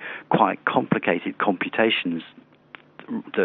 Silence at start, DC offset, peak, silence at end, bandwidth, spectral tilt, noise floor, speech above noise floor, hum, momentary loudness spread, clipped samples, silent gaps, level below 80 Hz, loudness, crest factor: 0 s; under 0.1%; -2 dBFS; 0 s; 4.5 kHz; -3 dB/octave; -49 dBFS; 26 dB; none; 13 LU; under 0.1%; none; -74 dBFS; -23 LUFS; 22 dB